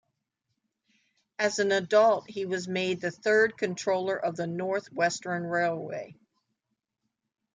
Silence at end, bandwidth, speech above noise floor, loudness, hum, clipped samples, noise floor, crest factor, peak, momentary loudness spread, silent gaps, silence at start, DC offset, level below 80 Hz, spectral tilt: 1.4 s; 9.6 kHz; 56 dB; -28 LUFS; none; under 0.1%; -83 dBFS; 18 dB; -12 dBFS; 10 LU; none; 1.4 s; under 0.1%; -74 dBFS; -4 dB/octave